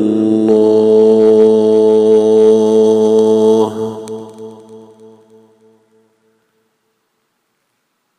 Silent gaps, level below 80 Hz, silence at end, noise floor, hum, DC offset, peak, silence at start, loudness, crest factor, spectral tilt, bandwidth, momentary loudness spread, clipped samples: none; -64 dBFS; 3.4 s; -66 dBFS; none; under 0.1%; 0 dBFS; 0 s; -10 LUFS; 12 dB; -7 dB/octave; 9.6 kHz; 17 LU; under 0.1%